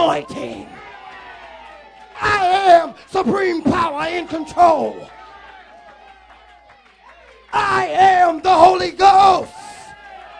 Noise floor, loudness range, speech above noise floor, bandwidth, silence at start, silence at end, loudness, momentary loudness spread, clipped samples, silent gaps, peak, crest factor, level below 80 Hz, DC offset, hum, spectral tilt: -48 dBFS; 8 LU; 33 dB; 10.5 kHz; 0 s; 0 s; -15 LUFS; 25 LU; under 0.1%; none; 0 dBFS; 18 dB; -50 dBFS; under 0.1%; none; -4.5 dB/octave